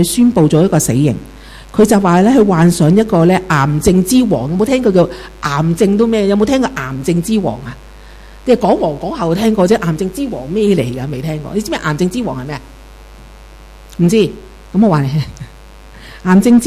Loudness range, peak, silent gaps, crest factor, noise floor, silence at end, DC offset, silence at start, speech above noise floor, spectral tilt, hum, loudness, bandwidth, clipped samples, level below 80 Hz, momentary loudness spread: 7 LU; 0 dBFS; none; 12 dB; -36 dBFS; 0 s; under 0.1%; 0 s; 24 dB; -6.5 dB/octave; none; -13 LUFS; 15.5 kHz; under 0.1%; -36 dBFS; 12 LU